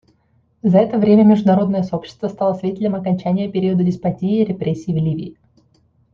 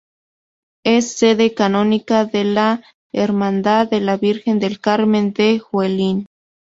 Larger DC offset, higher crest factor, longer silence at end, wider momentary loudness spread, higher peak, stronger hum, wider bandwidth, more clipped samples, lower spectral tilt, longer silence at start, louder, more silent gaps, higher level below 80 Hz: neither; about the same, 16 dB vs 14 dB; first, 0.8 s vs 0.45 s; first, 11 LU vs 5 LU; about the same, -2 dBFS vs -2 dBFS; neither; second, 6.8 kHz vs 7.8 kHz; neither; first, -9.5 dB/octave vs -5.5 dB/octave; second, 0.65 s vs 0.85 s; about the same, -17 LUFS vs -17 LUFS; second, none vs 2.94-3.10 s; about the same, -54 dBFS vs -58 dBFS